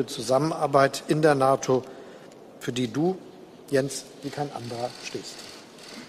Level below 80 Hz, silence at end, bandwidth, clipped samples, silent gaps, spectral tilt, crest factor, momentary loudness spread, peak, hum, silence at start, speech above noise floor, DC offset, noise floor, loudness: -66 dBFS; 0 s; 15.5 kHz; under 0.1%; none; -5 dB/octave; 22 dB; 22 LU; -6 dBFS; none; 0 s; 21 dB; under 0.1%; -46 dBFS; -26 LUFS